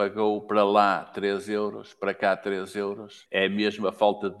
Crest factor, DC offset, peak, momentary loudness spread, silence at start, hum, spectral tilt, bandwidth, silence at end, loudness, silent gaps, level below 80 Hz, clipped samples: 20 dB; under 0.1%; -6 dBFS; 10 LU; 0 s; none; -5.5 dB/octave; 12.5 kHz; 0 s; -26 LUFS; none; -74 dBFS; under 0.1%